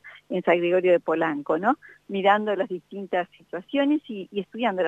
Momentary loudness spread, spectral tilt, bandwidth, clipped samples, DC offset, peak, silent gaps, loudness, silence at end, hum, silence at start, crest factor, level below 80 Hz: 12 LU; -7.5 dB/octave; 7.8 kHz; under 0.1%; under 0.1%; -6 dBFS; none; -25 LUFS; 0 s; none; 0.05 s; 18 dB; -76 dBFS